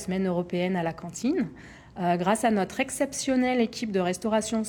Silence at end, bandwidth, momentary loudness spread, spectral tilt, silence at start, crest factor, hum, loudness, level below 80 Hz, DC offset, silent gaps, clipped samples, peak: 0 s; 19.5 kHz; 7 LU; -5 dB/octave; 0 s; 18 dB; none; -27 LUFS; -58 dBFS; under 0.1%; none; under 0.1%; -10 dBFS